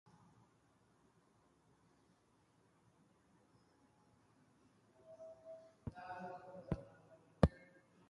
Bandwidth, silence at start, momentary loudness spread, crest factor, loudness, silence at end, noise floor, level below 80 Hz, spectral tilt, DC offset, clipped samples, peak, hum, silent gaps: 11 kHz; 5.05 s; 24 LU; 34 dB; -42 LUFS; 0.45 s; -74 dBFS; -56 dBFS; -8.5 dB/octave; under 0.1%; under 0.1%; -14 dBFS; none; none